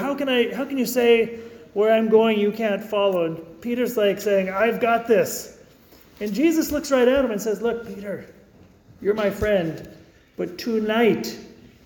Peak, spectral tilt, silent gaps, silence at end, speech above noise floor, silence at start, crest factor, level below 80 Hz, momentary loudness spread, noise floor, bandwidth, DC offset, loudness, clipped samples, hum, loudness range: -6 dBFS; -5 dB/octave; none; 0.35 s; 30 dB; 0 s; 16 dB; -52 dBFS; 15 LU; -51 dBFS; 19 kHz; under 0.1%; -22 LUFS; under 0.1%; none; 5 LU